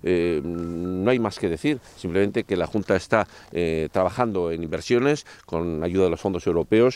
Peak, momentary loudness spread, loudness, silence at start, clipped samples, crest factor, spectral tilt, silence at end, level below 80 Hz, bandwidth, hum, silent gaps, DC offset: -6 dBFS; 7 LU; -24 LUFS; 0.05 s; under 0.1%; 18 dB; -6.5 dB/octave; 0 s; -52 dBFS; 12.5 kHz; none; none; under 0.1%